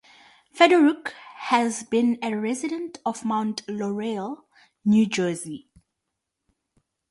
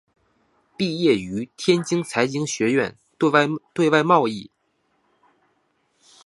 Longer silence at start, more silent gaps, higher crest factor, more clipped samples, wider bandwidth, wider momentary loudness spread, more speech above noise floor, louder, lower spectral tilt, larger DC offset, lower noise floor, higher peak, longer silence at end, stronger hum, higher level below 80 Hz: second, 0.55 s vs 0.8 s; neither; about the same, 22 dB vs 22 dB; neither; about the same, 11.5 kHz vs 11.5 kHz; first, 17 LU vs 9 LU; first, 59 dB vs 48 dB; about the same, -23 LUFS vs -21 LUFS; about the same, -5 dB/octave vs -5 dB/octave; neither; first, -82 dBFS vs -68 dBFS; about the same, -4 dBFS vs -2 dBFS; second, 1.55 s vs 1.8 s; neither; second, -70 dBFS vs -64 dBFS